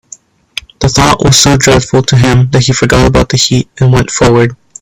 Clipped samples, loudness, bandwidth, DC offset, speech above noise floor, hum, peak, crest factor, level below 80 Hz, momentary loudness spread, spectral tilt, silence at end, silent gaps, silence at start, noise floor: 0.3%; -8 LUFS; 16 kHz; under 0.1%; 29 dB; none; 0 dBFS; 8 dB; -24 dBFS; 8 LU; -4.5 dB/octave; 0.25 s; none; 0.8 s; -36 dBFS